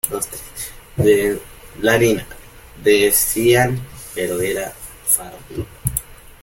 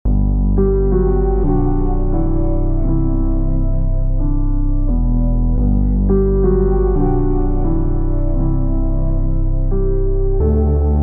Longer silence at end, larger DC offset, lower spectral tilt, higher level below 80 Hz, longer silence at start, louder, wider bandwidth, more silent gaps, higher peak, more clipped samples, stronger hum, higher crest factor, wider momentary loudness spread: first, 0.3 s vs 0 s; neither; second, -4 dB/octave vs -15 dB/octave; second, -42 dBFS vs -16 dBFS; about the same, 0.05 s vs 0.05 s; about the same, -18 LUFS vs -18 LUFS; first, 17 kHz vs 1.7 kHz; neither; first, 0 dBFS vs -4 dBFS; neither; neither; first, 20 dB vs 10 dB; first, 16 LU vs 5 LU